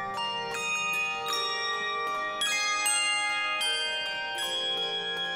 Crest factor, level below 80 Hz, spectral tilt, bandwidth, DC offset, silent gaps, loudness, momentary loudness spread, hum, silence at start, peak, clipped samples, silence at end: 14 dB; -70 dBFS; 1 dB/octave; 16 kHz; under 0.1%; none; -28 LUFS; 6 LU; none; 0 s; -16 dBFS; under 0.1%; 0 s